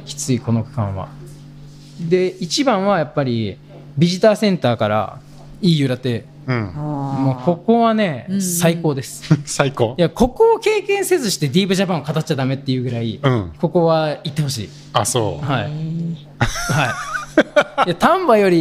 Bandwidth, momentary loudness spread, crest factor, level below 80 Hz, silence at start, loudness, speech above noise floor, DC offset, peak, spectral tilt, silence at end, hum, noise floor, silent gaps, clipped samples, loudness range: 16 kHz; 10 LU; 16 dB; -42 dBFS; 0 s; -18 LUFS; 21 dB; under 0.1%; -2 dBFS; -5.5 dB/octave; 0 s; none; -38 dBFS; none; under 0.1%; 3 LU